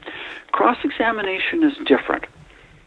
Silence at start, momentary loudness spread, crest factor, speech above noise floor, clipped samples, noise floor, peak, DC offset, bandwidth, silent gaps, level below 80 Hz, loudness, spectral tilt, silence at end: 0.05 s; 13 LU; 20 dB; 27 dB; under 0.1%; -47 dBFS; -2 dBFS; under 0.1%; 6.8 kHz; none; -54 dBFS; -20 LUFS; -6 dB/octave; 0.45 s